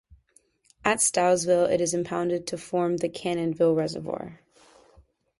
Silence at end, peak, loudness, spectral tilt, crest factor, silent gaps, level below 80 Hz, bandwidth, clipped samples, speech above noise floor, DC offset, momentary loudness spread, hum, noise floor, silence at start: 1.05 s; -4 dBFS; -25 LUFS; -4 dB/octave; 22 dB; none; -62 dBFS; 11.5 kHz; under 0.1%; 39 dB; under 0.1%; 10 LU; none; -64 dBFS; 0.85 s